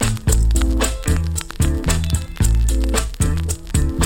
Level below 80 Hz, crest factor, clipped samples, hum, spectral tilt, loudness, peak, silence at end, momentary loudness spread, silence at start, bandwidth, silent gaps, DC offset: -20 dBFS; 14 dB; under 0.1%; none; -4.5 dB/octave; -20 LUFS; -2 dBFS; 0 s; 4 LU; 0 s; 17 kHz; none; under 0.1%